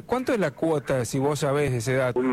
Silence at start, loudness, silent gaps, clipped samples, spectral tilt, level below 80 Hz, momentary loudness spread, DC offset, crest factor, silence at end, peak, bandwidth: 0.1 s; -25 LUFS; none; under 0.1%; -6 dB/octave; -52 dBFS; 2 LU; under 0.1%; 12 dB; 0 s; -12 dBFS; 15.5 kHz